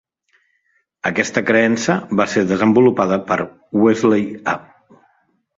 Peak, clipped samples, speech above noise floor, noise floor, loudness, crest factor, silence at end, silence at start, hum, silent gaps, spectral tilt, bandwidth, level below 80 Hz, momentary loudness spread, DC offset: -2 dBFS; under 0.1%; 49 dB; -65 dBFS; -17 LUFS; 16 dB; 0.95 s; 1.05 s; none; none; -5.5 dB/octave; 7.8 kHz; -56 dBFS; 9 LU; under 0.1%